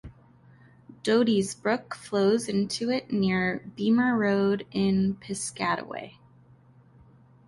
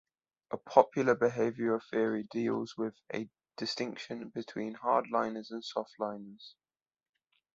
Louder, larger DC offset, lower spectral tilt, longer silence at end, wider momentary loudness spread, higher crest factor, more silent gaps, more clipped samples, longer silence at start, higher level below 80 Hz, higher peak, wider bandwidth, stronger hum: first, -26 LUFS vs -33 LUFS; neither; about the same, -5.5 dB/octave vs -5.5 dB/octave; first, 1.35 s vs 1.05 s; second, 9 LU vs 14 LU; second, 16 dB vs 28 dB; neither; neither; second, 0.05 s vs 0.5 s; first, -60 dBFS vs -76 dBFS; second, -10 dBFS vs -6 dBFS; first, 11.5 kHz vs 7.8 kHz; neither